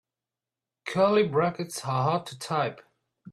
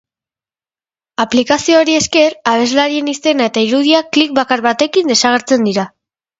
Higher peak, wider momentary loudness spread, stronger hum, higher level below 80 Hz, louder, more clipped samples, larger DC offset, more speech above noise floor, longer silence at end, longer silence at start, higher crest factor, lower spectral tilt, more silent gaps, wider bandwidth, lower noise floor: second, -10 dBFS vs 0 dBFS; first, 10 LU vs 5 LU; neither; second, -68 dBFS vs -54 dBFS; second, -27 LUFS vs -12 LUFS; neither; neither; second, 64 dB vs over 78 dB; second, 0 s vs 0.5 s; second, 0.85 s vs 1.2 s; about the same, 18 dB vs 14 dB; first, -5.5 dB/octave vs -3 dB/octave; neither; first, 14 kHz vs 8 kHz; about the same, -90 dBFS vs under -90 dBFS